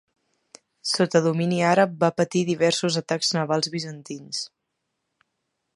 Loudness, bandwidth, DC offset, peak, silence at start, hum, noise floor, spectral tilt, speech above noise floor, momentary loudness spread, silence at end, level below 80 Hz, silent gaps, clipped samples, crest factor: -23 LUFS; 11.5 kHz; under 0.1%; -4 dBFS; 0.85 s; none; -79 dBFS; -4.5 dB/octave; 56 dB; 12 LU; 1.3 s; -72 dBFS; none; under 0.1%; 20 dB